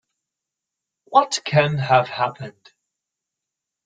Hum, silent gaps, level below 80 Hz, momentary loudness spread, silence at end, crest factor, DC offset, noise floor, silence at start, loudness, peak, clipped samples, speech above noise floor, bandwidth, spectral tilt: none; none; -62 dBFS; 12 LU; 1.35 s; 20 dB; under 0.1%; -85 dBFS; 1.1 s; -19 LUFS; -2 dBFS; under 0.1%; 65 dB; 9.4 kHz; -4.5 dB/octave